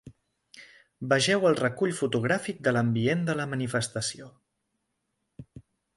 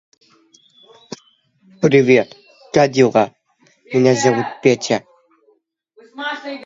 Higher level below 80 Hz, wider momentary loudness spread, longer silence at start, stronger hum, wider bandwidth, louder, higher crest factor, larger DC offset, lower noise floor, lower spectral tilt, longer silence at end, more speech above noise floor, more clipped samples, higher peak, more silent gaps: about the same, -64 dBFS vs -62 dBFS; second, 9 LU vs 18 LU; second, 0.05 s vs 1.8 s; neither; first, 11.5 kHz vs 7.8 kHz; second, -27 LUFS vs -16 LUFS; about the same, 20 dB vs 18 dB; neither; first, -79 dBFS vs -60 dBFS; about the same, -5 dB/octave vs -5.5 dB/octave; first, 0.35 s vs 0 s; first, 53 dB vs 46 dB; neither; second, -10 dBFS vs 0 dBFS; neither